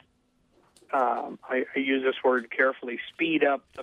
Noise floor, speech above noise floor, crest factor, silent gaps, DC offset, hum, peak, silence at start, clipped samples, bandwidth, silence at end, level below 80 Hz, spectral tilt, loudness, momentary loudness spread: -68 dBFS; 41 dB; 18 dB; none; under 0.1%; none; -10 dBFS; 0.9 s; under 0.1%; 10 kHz; 0 s; -74 dBFS; -5.5 dB/octave; -27 LUFS; 7 LU